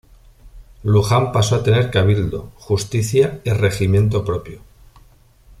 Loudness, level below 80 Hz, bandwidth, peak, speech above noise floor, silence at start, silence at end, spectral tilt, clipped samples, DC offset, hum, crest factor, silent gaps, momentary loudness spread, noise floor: -18 LUFS; -40 dBFS; 13.5 kHz; -2 dBFS; 33 dB; 0.45 s; 1 s; -6 dB/octave; under 0.1%; under 0.1%; none; 16 dB; none; 10 LU; -49 dBFS